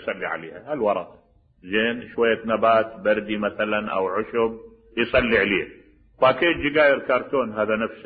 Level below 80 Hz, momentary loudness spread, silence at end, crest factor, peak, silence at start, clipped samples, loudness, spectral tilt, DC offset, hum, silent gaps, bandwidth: -50 dBFS; 10 LU; 0 s; 18 dB; -6 dBFS; 0 s; under 0.1%; -22 LUFS; -9.5 dB/octave; under 0.1%; none; none; 4.9 kHz